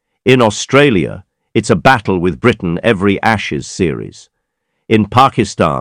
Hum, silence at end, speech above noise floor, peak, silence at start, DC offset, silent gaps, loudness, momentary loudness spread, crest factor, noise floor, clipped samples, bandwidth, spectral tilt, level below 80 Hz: none; 0 s; 58 dB; 0 dBFS; 0.25 s; under 0.1%; none; -13 LUFS; 9 LU; 14 dB; -70 dBFS; 0.9%; 15.5 kHz; -5.5 dB/octave; -40 dBFS